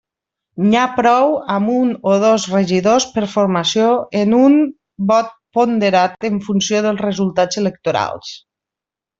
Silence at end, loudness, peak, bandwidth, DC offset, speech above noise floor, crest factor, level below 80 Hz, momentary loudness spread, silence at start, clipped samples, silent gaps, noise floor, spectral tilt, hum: 0.8 s; -15 LUFS; -2 dBFS; 7.8 kHz; under 0.1%; 72 dB; 14 dB; -56 dBFS; 7 LU; 0.55 s; under 0.1%; none; -87 dBFS; -5 dB/octave; none